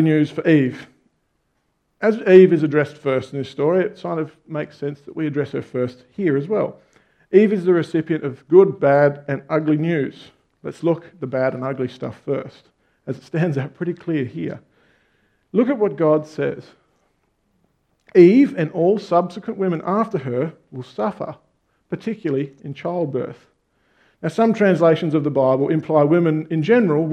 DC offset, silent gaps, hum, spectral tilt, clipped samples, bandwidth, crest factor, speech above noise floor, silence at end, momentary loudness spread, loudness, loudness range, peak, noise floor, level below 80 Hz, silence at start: under 0.1%; none; none; -8.5 dB/octave; under 0.1%; 8.6 kHz; 20 dB; 50 dB; 0 s; 15 LU; -19 LUFS; 8 LU; 0 dBFS; -69 dBFS; -66 dBFS; 0 s